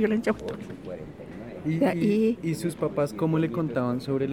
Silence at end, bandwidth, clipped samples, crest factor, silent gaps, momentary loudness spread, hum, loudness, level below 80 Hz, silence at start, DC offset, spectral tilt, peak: 0 s; 16 kHz; under 0.1%; 16 dB; none; 16 LU; none; -27 LUFS; -56 dBFS; 0 s; under 0.1%; -7.5 dB/octave; -10 dBFS